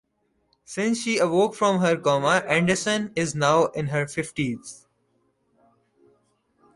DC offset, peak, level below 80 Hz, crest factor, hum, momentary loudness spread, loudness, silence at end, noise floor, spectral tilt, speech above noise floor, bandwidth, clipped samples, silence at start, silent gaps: under 0.1%; -6 dBFS; -60 dBFS; 18 dB; none; 8 LU; -23 LUFS; 2 s; -71 dBFS; -4.5 dB/octave; 48 dB; 11.5 kHz; under 0.1%; 0.7 s; none